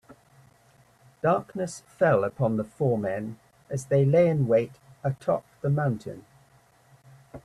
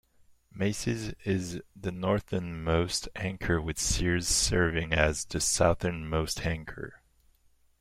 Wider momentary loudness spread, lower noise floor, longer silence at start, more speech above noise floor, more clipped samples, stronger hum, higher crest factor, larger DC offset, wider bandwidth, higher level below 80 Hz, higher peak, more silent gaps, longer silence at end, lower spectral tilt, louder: first, 14 LU vs 11 LU; second, -60 dBFS vs -65 dBFS; first, 1.25 s vs 0.55 s; about the same, 35 dB vs 36 dB; neither; neither; about the same, 18 dB vs 22 dB; neither; second, 12 kHz vs 16 kHz; second, -62 dBFS vs -42 dBFS; about the same, -10 dBFS vs -8 dBFS; neither; second, 0.05 s vs 0.85 s; first, -8 dB/octave vs -4 dB/octave; first, -26 LUFS vs -29 LUFS